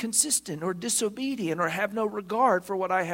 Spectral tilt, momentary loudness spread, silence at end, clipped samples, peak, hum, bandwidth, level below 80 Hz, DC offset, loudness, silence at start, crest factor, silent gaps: -2.5 dB/octave; 7 LU; 0 s; under 0.1%; -8 dBFS; none; 16.5 kHz; -68 dBFS; under 0.1%; -27 LUFS; 0 s; 18 dB; none